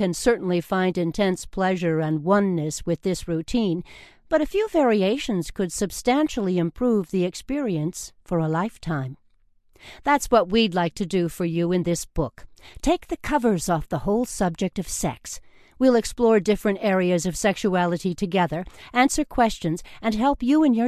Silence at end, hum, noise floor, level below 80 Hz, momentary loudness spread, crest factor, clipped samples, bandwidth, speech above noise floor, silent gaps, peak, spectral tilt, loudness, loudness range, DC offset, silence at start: 0 s; none; -59 dBFS; -44 dBFS; 8 LU; 18 dB; under 0.1%; 14 kHz; 36 dB; none; -6 dBFS; -5.5 dB/octave; -23 LUFS; 3 LU; under 0.1%; 0 s